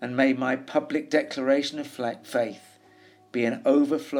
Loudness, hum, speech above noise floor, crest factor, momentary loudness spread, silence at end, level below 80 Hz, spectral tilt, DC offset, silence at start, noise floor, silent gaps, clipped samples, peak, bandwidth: -26 LUFS; none; 30 dB; 18 dB; 10 LU; 0 s; -80 dBFS; -5 dB/octave; under 0.1%; 0 s; -55 dBFS; none; under 0.1%; -8 dBFS; 15 kHz